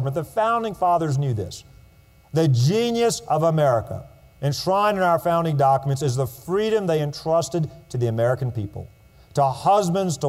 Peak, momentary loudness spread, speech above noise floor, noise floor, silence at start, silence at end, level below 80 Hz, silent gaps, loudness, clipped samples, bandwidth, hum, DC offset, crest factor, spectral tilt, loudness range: -8 dBFS; 10 LU; 31 dB; -52 dBFS; 0 s; 0 s; -52 dBFS; none; -22 LUFS; under 0.1%; 16 kHz; none; under 0.1%; 14 dB; -6 dB/octave; 3 LU